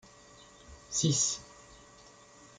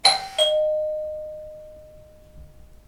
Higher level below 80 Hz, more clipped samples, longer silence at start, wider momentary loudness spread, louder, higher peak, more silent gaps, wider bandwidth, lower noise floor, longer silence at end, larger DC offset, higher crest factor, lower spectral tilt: second, -64 dBFS vs -52 dBFS; neither; first, 0.7 s vs 0.05 s; first, 26 LU vs 22 LU; second, -30 LUFS vs -22 LUFS; second, -16 dBFS vs -2 dBFS; neither; second, 10 kHz vs 16 kHz; first, -56 dBFS vs -47 dBFS; first, 0.85 s vs 0.2 s; neither; about the same, 20 dB vs 24 dB; first, -3 dB/octave vs 0 dB/octave